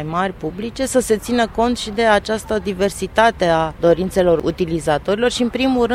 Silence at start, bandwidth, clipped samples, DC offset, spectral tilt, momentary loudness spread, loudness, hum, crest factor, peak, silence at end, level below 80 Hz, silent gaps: 0 s; 16 kHz; under 0.1%; under 0.1%; -4.5 dB/octave; 6 LU; -18 LUFS; none; 16 dB; 0 dBFS; 0 s; -38 dBFS; none